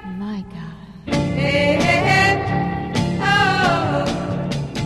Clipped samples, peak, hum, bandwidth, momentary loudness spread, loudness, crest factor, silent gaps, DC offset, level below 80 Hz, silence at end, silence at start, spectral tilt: under 0.1%; -4 dBFS; none; 13 kHz; 15 LU; -18 LUFS; 16 dB; none; under 0.1%; -38 dBFS; 0 s; 0 s; -5.5 dB/octave